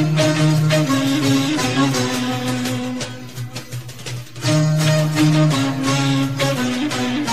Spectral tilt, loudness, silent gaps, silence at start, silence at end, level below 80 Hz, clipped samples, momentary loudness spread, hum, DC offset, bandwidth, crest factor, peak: -5 dB/octave; -18 LUFS; none; 0 s; 0 s; -50 dBFS; under 0.1%; 14 LU; none; 0.9%; 15.5 kHz; 14 dB; -4 dBFS